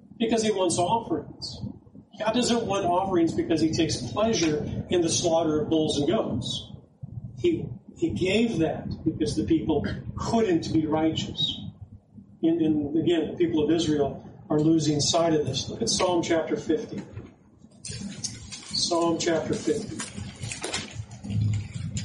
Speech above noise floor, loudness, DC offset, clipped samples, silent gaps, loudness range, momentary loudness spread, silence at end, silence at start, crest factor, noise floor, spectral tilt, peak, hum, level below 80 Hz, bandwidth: 29 dB; -26 LUFS; under 0.1%; under 0.1%; none; 4 LU; 13 LU; 0 s; 0.2 s; 14 dB; -53 dBFS; -5 dB/octave; -12 dBFS; none; -50 dBFS; 11.5 kHz